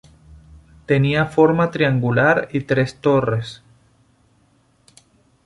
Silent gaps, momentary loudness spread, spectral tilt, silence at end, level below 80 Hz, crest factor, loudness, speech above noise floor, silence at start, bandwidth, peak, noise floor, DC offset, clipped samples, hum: none; 6 LU; -7.5 dB/octave; 1.9 s; -50 dBFS; 18 dB; -18 LUFS; 41 dB; 0.9 s; 11.5 kHz; -2 dBFS; -59 dBFS; under 0.1%; under 0.1%; none